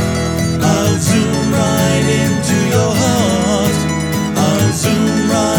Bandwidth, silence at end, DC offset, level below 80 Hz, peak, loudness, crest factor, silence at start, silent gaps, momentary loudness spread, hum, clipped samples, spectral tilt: over 20 kHz; 0 s; under 0.1%; -34 dBFS; 0 dBFS; -14 LUFS; 12 dB; 0 s; none; 3 LU; none; under 0.1%; -5 dB/octave